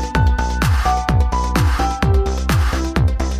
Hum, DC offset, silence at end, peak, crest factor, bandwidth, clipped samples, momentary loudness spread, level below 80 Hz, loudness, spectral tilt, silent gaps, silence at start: none; under 0.1%; 0 s; -2 dBFS; 14 dB; 15.5 kHz; under 0.1%; 1 LU; -18 dBFS; -18 LUFS; -6 dB/octave; none; 0 s